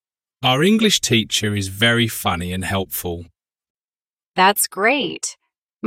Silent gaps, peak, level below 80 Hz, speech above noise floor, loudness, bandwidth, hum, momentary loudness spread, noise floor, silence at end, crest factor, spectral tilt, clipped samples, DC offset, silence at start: 3.70-3.75 s, 3.84-3.88 s, 4.13-4.17 s, 4.27-4.32 s, 5.58-5.67 s, 5.76-5.80 s; -2 dBFS; -50 dBFS; over 72 dB; -18 LUFS; 16.5 kHz; none; 12 LU; under -90 dBFS; 0 s; 18 dB; -3.5 dB/octave; under 0.1%; under 0.1%; 0.4 s